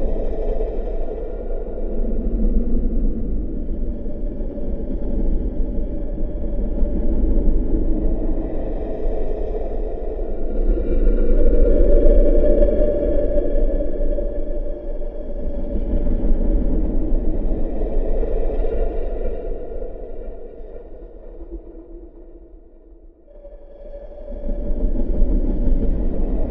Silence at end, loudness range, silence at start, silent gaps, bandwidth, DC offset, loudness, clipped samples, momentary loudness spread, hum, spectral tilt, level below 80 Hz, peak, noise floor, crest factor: 0 s; 16 LU; 0 s; none; 2.3 kHz; under 0.1%; -24 LUFS; under 0.1%; 18 LU; none; -12 dB/octave; -20 dBFS; 0 dBFS; -44 dBFS; 18 dB